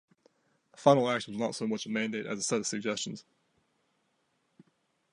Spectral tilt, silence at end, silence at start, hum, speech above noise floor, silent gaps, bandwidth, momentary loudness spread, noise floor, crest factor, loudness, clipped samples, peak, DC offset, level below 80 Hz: -4 dB/octave; 1.9 s; 0.8 s; none; 45 dB; none; 11.5 kHz; 10 LU; -76 dBFS; 26 dB; -30 LUFS; under 0.1%; -8 dBFS; under 0.1%; -78 dBFS